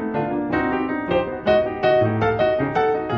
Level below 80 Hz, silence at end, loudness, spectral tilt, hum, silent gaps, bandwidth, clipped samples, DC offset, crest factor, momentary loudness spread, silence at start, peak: -46 dBFS; 0 s; -20 LUFS; -8.5 dB/octave; none; none; 6.4 kHz; under 0.1%; under 0.1%; 14 dB; 5 LU; 0 s; -6 dBFS